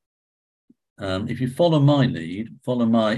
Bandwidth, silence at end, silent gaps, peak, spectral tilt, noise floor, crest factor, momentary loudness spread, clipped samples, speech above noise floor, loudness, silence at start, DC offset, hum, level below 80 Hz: 12 kHz; 0 s; none; -6 dBFS; -8 dB/octave; under -90 dBFS; 16 dB; 14 LU; under 0.1%; over 70 dB; -21 LUFS; 1 s; under 0.1%; none; -52 dBFS